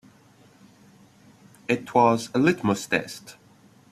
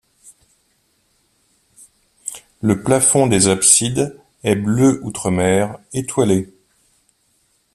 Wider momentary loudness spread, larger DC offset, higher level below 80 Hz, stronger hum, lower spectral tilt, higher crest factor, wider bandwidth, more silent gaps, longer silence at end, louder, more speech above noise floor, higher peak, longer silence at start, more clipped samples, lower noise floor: about the same, 19 LU vs 17 LU; neither; second, -64 dBFS vs -52 dBFS; neither; first, -5.5 dB/octave vs -4 dB/octave; about the same, 22 dB vs 20 dB; about the same, 14 kHz vs 14.5 kHz; neither; second, 0.6 s vs 1.3 s; second, -23 LUFS vs -16 LUFS; second, 32 dB vs 47 dB; second, -6 dBFS vs 0 dBFS; second, 1.7 s vs 2.25 s; neither; second, -55 dBFS vs -63 dBFS